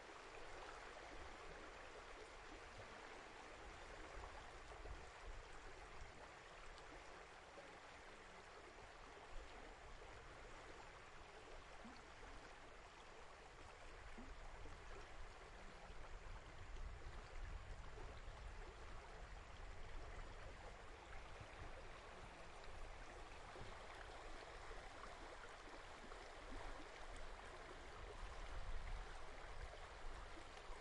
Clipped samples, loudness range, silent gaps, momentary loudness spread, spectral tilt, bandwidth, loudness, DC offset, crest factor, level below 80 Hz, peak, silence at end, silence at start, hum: under 0.1%; 3 LU; none; 4 LU; -4 dB/octave; 11 kHz; -58 LUFS; under 0.1%; 18 dB; -58 dBFS; -38 dBFS; 0 s; 0 s; none